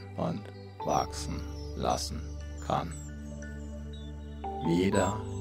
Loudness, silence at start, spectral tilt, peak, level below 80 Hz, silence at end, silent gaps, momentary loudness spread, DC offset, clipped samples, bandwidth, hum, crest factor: -34 LUFS; 0 s; -5.5 dB/octave; -12 dBFS; -42 dBFS; 0 s; none; 14 LU; under 0.1%; under 0.1%; 16 kHz; none; 22 dB